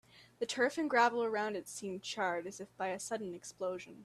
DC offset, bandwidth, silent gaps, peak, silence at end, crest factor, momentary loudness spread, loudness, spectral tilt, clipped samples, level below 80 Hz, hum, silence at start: under 0.1%; 14 kHz; none; -16 dBFS; 0 s; 20 dB; 12 LU; -36 LUFS; -3 dB/octave; under 0.1%; -80 dBFS; none; 0.15 s